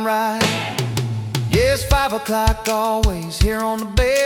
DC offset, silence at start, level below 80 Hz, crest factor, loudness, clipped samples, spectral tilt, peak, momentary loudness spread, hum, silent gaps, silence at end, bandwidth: under 0.1%; 0 s; -26 dBFS; 14 dB; -19 LUFS; under 0.1%; -4.5 dB/octave; -4 dBFS; 5 LU; none; none; 0 s; 18 kHz